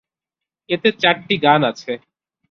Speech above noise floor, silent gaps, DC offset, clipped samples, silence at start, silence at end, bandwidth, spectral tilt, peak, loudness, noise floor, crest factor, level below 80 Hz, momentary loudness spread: 69 dB; none; under 0.1%; under 0.1%; 0.7 s; 0.55 s; 7.4 kHz; -5.5 dB/octave; -2 dBFS; -17 LUFS; -86 dBFS; 18 dB; -62 dBFS; 14 LU